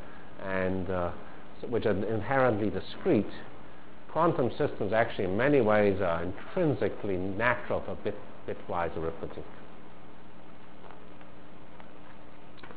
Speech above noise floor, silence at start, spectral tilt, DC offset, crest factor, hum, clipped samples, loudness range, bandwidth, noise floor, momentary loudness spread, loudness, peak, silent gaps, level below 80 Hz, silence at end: 22 dB; 0 s; -5.5 dB/octave; 2%; 22 dB; none; under 0.1%; 12 LU; 4 kHz; -51 dBFS; 25 LU; -30 LUFS; -10 dBFS; none; -52 dBFS; 0 s